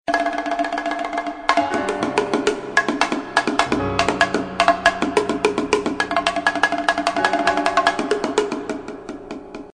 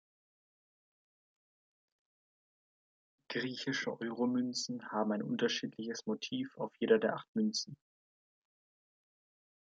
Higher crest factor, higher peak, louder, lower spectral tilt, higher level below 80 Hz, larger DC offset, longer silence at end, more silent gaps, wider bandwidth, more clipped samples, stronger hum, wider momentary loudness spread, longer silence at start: about the same, 20 dB vs 24 dB; first, 0 dBFS vs -14 dBFS; first, -20 LUFS vs -36 LUFS; about the same, -3.5 dB/octave vs -4 dB/octave; first, -48 dBFS vs -86 dBFS; neither; second, 0.05 s vs 2.05 s; second, none vs 7.28-7.35 s; first, 13 kHz vs 9.2 kHz; neither; neither; about the same, 7 LU vs 9 LU; second, 0.05 s vs 3.3 s